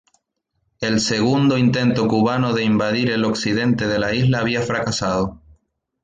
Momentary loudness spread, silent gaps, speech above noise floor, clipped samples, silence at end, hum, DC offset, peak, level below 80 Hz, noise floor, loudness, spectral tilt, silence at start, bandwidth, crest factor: 5 LU; none; 54 dB; under 0.1%; 0.7 s; none; under 0.1%; -6 dBFS; -48 dBFS; -72 dBFS; -19 LUFS; -5.5 dB/octave; 0.8 s; 9.4 kHz; 14 dB